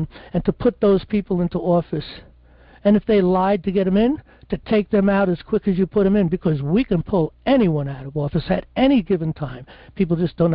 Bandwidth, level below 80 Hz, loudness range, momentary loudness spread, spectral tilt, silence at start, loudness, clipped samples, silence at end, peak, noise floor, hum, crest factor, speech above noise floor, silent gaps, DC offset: 5.4 kHz; -42 dBFS; 2 LU; 10 LU; -12.5 dB/octave; 0 s; -20 LUFS; under 0.1%; 0 s; -6 dBFS; -49 dBFS; none; 14 dB; 29 dB; none; under 0.1%